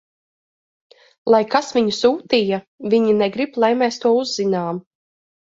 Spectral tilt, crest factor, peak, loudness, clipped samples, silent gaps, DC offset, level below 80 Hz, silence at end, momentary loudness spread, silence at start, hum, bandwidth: -5 dB/octave; 18 dB; -2 dBFS; -18 LUFS; under 0.1%; 2.67-2.78 s; under 0.1%; -64 dBFS; 0.65 s; 8 LU; 1.25 s; none; 7.8 kHz